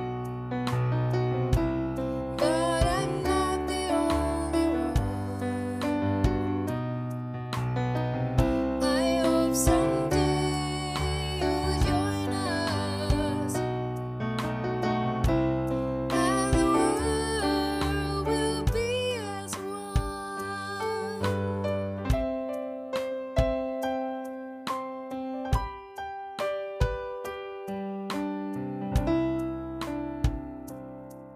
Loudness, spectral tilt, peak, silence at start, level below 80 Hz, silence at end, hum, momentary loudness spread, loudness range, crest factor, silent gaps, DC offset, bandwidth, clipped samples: -29 LUFS; -5.5 dB/octave; -10 dBFS; 0 s; -38 dBFS; 0 s; none; 10 LU; 6 LU; 18 dB; none; under 0.1%; 15.5 kHz; under 0.1%